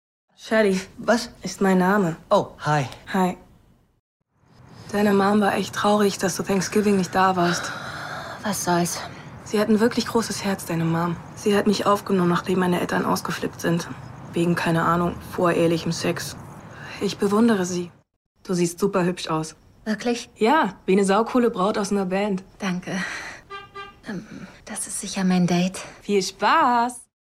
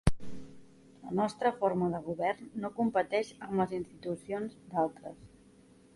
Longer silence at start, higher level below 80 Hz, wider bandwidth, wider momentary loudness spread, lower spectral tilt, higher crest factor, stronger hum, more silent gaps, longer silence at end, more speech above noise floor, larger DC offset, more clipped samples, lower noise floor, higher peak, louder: first, 0.4 s vs 0.05 s; about the same, -54 dBFS vs -50 dBFS; first, 16 kHz vs 11.5 kHz; second, 15 LU vs 19 LU; second, -5 dB/octave vs -7 dB/octave; second, 16 dB vs 22 dB; neither; first, 3.99-4.20 s, 18.16-18.35 s vs none; second, 0.2 s vs 0.7 s; first, 34 dB vs 27 dB; neither; neither; second, -56 dBFS vs -60 dBFS; first, -6 dBFS vs -10 dBFS; first, -22 LUFS vs -33 LUFS